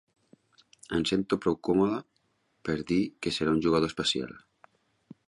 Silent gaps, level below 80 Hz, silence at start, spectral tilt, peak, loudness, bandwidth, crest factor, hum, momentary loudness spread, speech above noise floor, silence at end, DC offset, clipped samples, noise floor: none; -56 dBFS; 0.9 s; -5 dB/octave; -12 dBFS; -28 LUFS; 11.5 kHz; 18 dB; none; 8 LU; 45 dB; 0.9 s; under 0.1%; under 0.1%; -73 dBFS